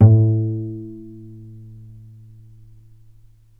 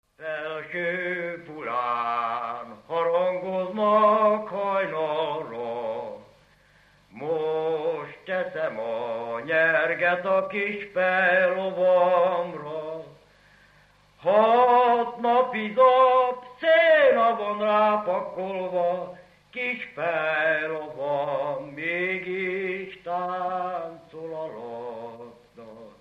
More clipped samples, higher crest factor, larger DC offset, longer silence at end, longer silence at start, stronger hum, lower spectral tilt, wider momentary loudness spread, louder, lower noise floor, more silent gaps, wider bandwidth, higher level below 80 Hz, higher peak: neither; about the same, 20 dB vs 16 dB; neither; first, 2.15 s vs 0.1 s; second, 0 s vs 0.2 s; second, none vs 50 Hz at -65 dBFS; first, -13.5 dB/octave vs -6.5 dB/octave; first, 27 LU vs 16 LU; first, -19 LUFS vs -24 LUFS; second, -48 dBFS vs -58 dBFS; neither; second, 1.5 kHz vs 6 kHz; first, -52 dBFS vs -70 dBFS; first, 0 dBFS vs -8 dBFS